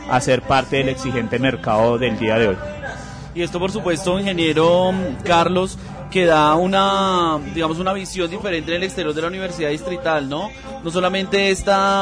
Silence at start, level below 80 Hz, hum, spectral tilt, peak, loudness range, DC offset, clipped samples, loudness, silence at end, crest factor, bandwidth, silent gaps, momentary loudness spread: 0 s; -40 dBFS; none; -5 dB/octave; -6 dBFS; 5 LU; under 0.1%; under 0.1%; -19 LUFS; 0 s; 14 dB; 10.5 kHz; none; 10 LU